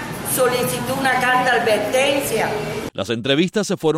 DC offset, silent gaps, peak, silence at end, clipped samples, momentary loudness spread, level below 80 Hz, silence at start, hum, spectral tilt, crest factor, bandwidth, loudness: under 0.1%; none; -4 dBFS; 0 s; under 0.1%; 8 LU; -50 dBFS; 0 s; none; -3.5 dB/octave; 16 dB; 16 kHz; -19 LUFS